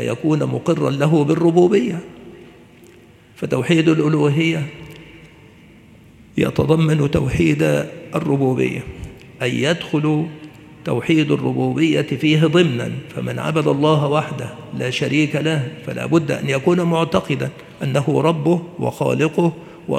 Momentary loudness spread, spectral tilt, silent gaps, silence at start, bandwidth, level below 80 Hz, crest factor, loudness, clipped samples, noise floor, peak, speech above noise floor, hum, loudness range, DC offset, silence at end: 13 LU; -6.5 dB/octave; none; 0 s; 13.5 kHz; -46 dBFS; 18 dB; -18 LUFS; under 0.1%; -46 dBFS; 0 dBFS; 29 dB; none; 2 LU; under 0.1%; 0 s